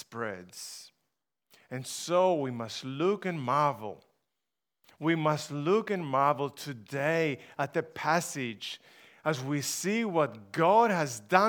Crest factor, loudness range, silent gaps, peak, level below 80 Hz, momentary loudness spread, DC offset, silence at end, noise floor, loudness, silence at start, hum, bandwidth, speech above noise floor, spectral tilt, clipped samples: 24 dB; 3 LU; none; -6 dBFS; -82 dBFS; 14 LU; under 0.1%; 0 s; -89 dBFS; -30 LUFS; 0.1 s; none; over 20 kHz; 59 dB; -4.5 dB/octave; under 0.1%